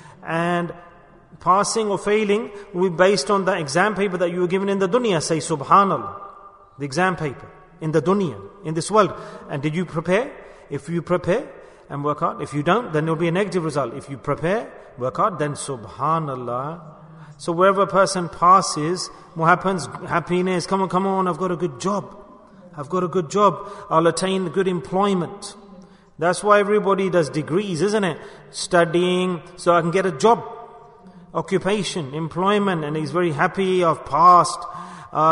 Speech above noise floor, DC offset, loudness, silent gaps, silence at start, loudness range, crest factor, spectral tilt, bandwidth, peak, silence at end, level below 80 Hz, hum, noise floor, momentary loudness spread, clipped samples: 27 dB; under 0.1%; -21 LUFS; none; 0.05 s; 5 LU; 20 dB; -5 dB/octave; 11 kHz; -2 dBFS; 0 s; -56 dBFS; none; -47 dBFS; 14 LU; under 0.1%